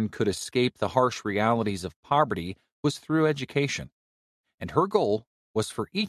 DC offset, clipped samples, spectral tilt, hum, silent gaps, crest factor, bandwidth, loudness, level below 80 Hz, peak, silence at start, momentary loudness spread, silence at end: under 0.1%; under 0.1%; -5.5 dB/octave; none; 1.96-2.03 s, 2.72-2.83 s, 3.92-4.44 s, 4.54-4.58 s, 5.27-5.54 s; 20 dB; 14 kHz; -27 LUFS; -54 dBFS; -8 dBFS; 0 s; 9 LU; 0 s